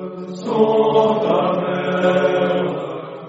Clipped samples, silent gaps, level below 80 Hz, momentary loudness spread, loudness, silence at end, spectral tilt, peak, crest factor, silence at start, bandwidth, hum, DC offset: under 0.1%; none; -64 dBFS; 12 LU; -17 LUFS; 0 s; -5 dB/octave; -4 dBFS; 14 dB; 0 s; 7.8 kHz; none; under 0.1%